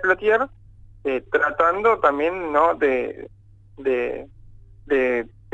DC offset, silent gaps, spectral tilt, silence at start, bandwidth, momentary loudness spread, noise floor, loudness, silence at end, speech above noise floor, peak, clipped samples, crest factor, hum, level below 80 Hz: under 0.1%; none; -6 dB/octave; 0 s; 8 kHz; 11 LU; -45 dBFS; -21 LUFS; 0.25 s; 24 dB; -4 dBFS; under 0.1%; 18 dB; none; -50 dBFS